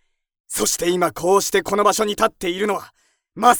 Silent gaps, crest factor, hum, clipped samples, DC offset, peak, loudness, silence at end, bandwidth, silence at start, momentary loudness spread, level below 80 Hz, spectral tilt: none; 20 dB; none; under 0.1%; under 0.1%; 0 dBFS; -19 LUFS; 0 s; over 20 kHz; 0.5 s; 6 LU; -50 dBFS; -3 dB/octave